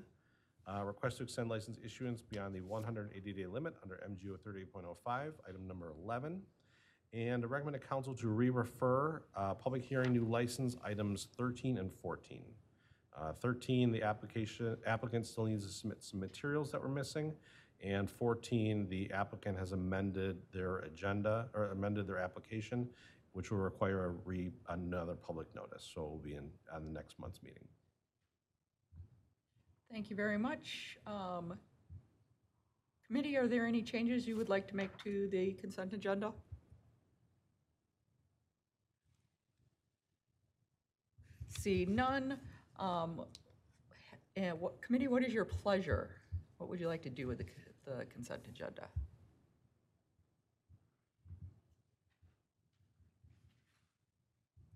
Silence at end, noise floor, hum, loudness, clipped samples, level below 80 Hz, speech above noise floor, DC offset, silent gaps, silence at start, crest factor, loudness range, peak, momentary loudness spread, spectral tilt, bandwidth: 0.15 s; -89 dBFS; none; -41 LUFS; under 0.1%; -66 dBFS; 49 dB; under 0.1%; none; 0 s; 20 dB; 11 LU; -22 dBFS; 16 LU; -6.5 dB/octave; 14.5 kHz